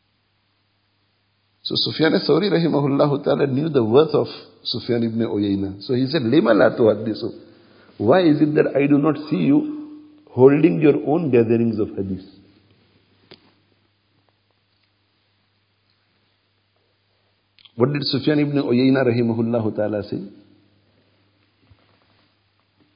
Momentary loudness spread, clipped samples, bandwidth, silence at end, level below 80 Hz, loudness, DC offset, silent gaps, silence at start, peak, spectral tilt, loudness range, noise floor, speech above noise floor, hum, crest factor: 14 LU; under 0.1%; 5.4 kHz; 2.65 s; -58 dBFS; -19 LUFS; under 0.1%; none; 1.65 s; 0 dBFS; -11.5 dB/octave; 10 LU; -66 dBFS; 48 dB; none; 20 dB